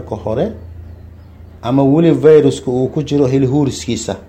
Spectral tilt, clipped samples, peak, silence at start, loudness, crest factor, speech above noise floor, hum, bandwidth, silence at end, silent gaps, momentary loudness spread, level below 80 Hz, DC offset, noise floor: -7 dB/octave; under 0.1%; 0 dBFS; 0 s; -13 LUFS; 14 dB; 24 dB; none; 9.4 kHz; 0.05 s; none; 13 LU; -40 dBFS; under 0.1%; -37 dBFS